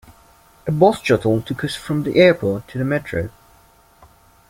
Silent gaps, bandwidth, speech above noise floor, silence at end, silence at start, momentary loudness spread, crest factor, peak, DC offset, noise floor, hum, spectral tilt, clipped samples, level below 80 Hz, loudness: none; 16.5 kHz; 34 dB; 1.2 s; 0.65 s; 13 LU; 18 dB; -2 dBFS; under 0.1%; -52 dBFS; none; -6.5 dB/octave; under 0.1%; -50 dBFS; -18 LUFS